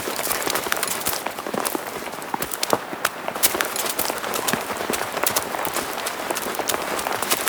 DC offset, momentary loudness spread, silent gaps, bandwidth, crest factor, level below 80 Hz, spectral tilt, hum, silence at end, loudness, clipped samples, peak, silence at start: under 0.1%; 6 LU; none; over 20 kHz; 26 dB; -56 dBFS; -1.5 dB/octave; none; 0 s; -23 LUFS; under 0.1%; 0 dBFS; 0 s